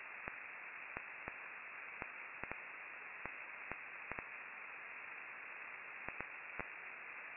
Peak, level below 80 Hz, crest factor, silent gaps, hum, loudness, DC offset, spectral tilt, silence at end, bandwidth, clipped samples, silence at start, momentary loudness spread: -22 dBFS; -74 dBFS; 28 dB; none; none; -48 LUFS; under 0.1%; 2 dB/octave; 0 s; 3.5 kHz; under 0.1%; 0 s; 2 LU